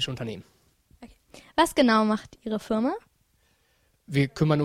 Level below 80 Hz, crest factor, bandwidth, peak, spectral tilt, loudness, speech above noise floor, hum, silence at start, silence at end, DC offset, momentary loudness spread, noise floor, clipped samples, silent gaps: -56 dBFS; 18 dB; 14 kHz; -8 dBFS; -5.5 dB/octave; -25 LUFS; 43 dB; none; 0 s; 0 s; under 0.1%; 15 LU; -67 dBFS; under 0.1%; none